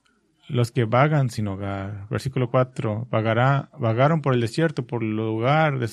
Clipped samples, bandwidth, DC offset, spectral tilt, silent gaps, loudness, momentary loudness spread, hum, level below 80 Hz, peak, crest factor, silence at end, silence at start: under 0.1%; 12.5 kHz; under 0.1%; -7.5 dB/octave; none; -23 LUFS; 9 LU; none; -58 dBFS; -4 dBFS; 20 dB; 0 s; 0.5 s